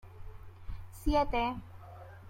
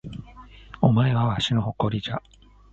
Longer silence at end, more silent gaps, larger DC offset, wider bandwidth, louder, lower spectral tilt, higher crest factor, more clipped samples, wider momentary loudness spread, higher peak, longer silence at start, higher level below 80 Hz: second, 0 s vs 0.55 s; neither; neither; first, 16.5 kHz vs 7.8 kHz; second, -33 LUFS vs -23 LUFS; about the same, -6 dB/octave vs -7 dB/octave; about the same, 20 dB vs 22 dB; neither; first, 23 LU vs 15 LU; second, -16 dBFS vs -4 dBFS; about the same, 0.05 s vs 0.05 s; about the same, -44 dBFS vs -48 dBFS